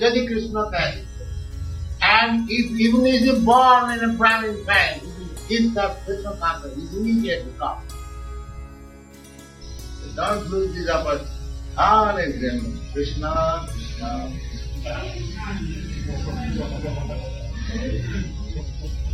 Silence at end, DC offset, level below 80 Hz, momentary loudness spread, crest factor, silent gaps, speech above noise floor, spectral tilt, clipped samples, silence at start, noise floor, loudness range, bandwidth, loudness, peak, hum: 0 s; under 0.1%; -32 dBFS; 18 LU; 20 dB; none; 22 dB; -5.5 dB/octave; under 0.1%; 0 s; -43 dBFS; 12 LU; 14 kHz; -22 LUFS; -2 dBFS; none